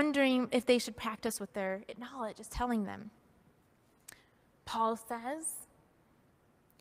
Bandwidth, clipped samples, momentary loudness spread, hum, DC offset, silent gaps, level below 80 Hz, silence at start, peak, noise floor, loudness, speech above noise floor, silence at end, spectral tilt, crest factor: 16 kHz; under 0.1%; 24 LU; none; under 0.1%; none; -60 dBFS; 0 s; -16 dBFS; -68 dBFS; -35 LUFS; 34 dB; 1.15 s; -3.5 dB/octave; 20 dB